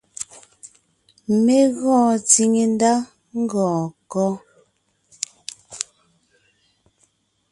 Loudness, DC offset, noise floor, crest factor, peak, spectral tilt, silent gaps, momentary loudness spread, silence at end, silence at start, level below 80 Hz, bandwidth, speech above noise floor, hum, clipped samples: -19 LUFS; under 0.1%; -65 dBFS; 22 dB; 0 dBFS; -4.5 dB/octave; none; 19 LU; 1.7 s; 0.2 s; -66 dBFS; 11.5 kHz; 47 dB; none; under 0.1%